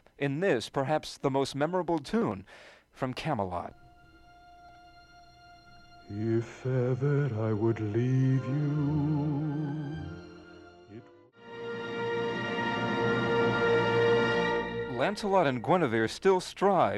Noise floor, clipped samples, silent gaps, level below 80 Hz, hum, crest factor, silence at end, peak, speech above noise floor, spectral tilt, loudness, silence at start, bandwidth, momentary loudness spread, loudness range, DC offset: -56 dBFS; under 0.1%; none; -60 dBFS; none; 18 dB; 0 s; -12 dBFS; 27 dB; -7 dB/octave; -29 LUFS; 0.2 s; 12 kHz; 13 LU; 11 LU; under 0.1%